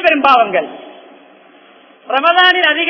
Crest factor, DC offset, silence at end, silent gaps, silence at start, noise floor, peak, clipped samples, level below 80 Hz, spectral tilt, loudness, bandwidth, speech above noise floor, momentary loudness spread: 14 dB; under 0.1%; 0 s; none; 0 s; -44 dBFS; 0 dBFS; 0.3%; -60 dBFS; -4 dB/octave; -11 LUFS; 5.4 kHz; 32 dB; 10 LU